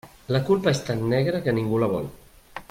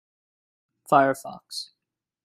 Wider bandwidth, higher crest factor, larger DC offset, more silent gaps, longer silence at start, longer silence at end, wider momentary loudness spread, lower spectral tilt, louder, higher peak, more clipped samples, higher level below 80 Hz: about the same, 16.5 kHz vs 16 kHz; second, 16 dB vs 24 dB; neither; neither; second, 0.05 s vs 0.9 s; second, 0.1 s vs 0.6 s; about the same, 15 LU vs 15 LU; first, -6.5 dB/octave vs -4.5 dB/octave; about the same, -24 LUFS vs -22 LUFS; second, -8 dBFS vs -4 dBFS; neither; first, -52 dBFS vs -72 dBFS